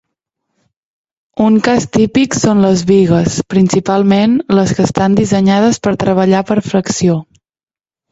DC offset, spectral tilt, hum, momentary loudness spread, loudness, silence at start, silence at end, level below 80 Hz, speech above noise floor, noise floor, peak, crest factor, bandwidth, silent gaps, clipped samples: under 0.1%; -6 dB/octave; none; 4 LU; -12 LUFS; 1.35 s; 0.9 s; -42 dBFS; over 79 dB; under -90 dBFS; 0 dBFS; 12 dB; 8 kHz; none; under 0.1%